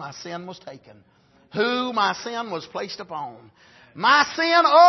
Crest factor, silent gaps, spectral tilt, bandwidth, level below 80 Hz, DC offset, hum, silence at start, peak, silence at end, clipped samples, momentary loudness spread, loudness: 20 dB; none; -3 dB/octave; 6.2 kHz; -72 dBFS; under 0.1%; none; 0 s; -2 dBFS; 0 s; under 0.1%; 19 LU; -22 LUFS